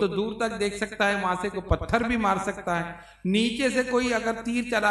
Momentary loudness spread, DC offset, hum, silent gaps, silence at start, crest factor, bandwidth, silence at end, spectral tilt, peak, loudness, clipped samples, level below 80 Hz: 5 LU; under 0.1%; 50 Hz at -50 dBFS; none; 0 s; 18 dB; 12 kHz; 0 s; -5 dB/octave; -8 dBFS; -26 LUFS; under 0.1%; -42 dBFS